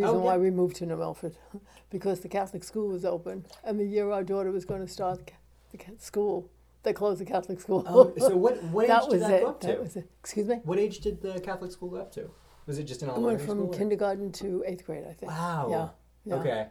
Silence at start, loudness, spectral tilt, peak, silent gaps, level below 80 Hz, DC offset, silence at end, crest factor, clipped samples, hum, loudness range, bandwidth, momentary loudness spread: 0 s; -29 LUFS; -6.5 dB/octave; -4 dBFS; none; -58 dBFS; under 0.1%; 0 s; 24 dB; under 0.1%; none; 9 LU; 16 kHz; 17 LU